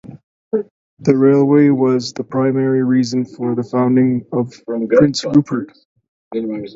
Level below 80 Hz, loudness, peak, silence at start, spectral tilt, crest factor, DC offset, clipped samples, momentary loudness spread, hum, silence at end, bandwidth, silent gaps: -56 dBFS; -16 LUFS; 0 dBFS; 0.05 s; -7 dB/octave; 16 dB; under 0.1%; under 0.1%; 12 LU; none; 0.05 s; 7.8 kHz; 0.23-0.51 s, 0.71-0.97 s, 5.85-5.96 s, 6.08-6.31 s